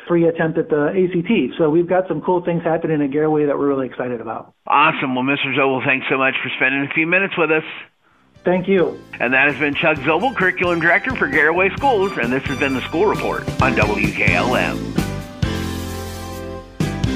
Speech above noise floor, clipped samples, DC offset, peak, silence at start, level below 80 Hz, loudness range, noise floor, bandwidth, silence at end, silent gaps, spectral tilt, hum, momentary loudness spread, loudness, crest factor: 36 dB; under 0.1%; under 0.1%; -2 dBFS; 0 s; -40 dBFS; 3 LU; -53 dBFS; 15.5 kHz; 0 s; none; -6 dB/octave; none; 10 LU; -18 LUFS; 16 dB